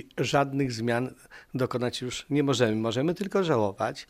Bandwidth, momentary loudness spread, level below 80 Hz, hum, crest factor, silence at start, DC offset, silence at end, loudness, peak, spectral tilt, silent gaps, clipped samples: 15.5 kHz; 6 LU; -60 dBFS; none; 18 dB; 0.15 s; under 0.1%; 0.05 s; -27 LUFS; -10 dBFS; -5.5 dB/octave; none; under 0.1%